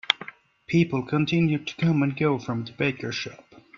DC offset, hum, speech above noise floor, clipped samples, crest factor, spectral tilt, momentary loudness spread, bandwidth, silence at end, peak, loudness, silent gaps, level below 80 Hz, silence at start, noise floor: under 0.1%; none; 20 dB; under 0.1%; 26 dB; -6.5 dB/octave; 9 LU; 7.2 kHz; 0.4 s; 0 dBFS; -25 LUFS; none; -60 dBFS; 0.1 s; -44 dBFS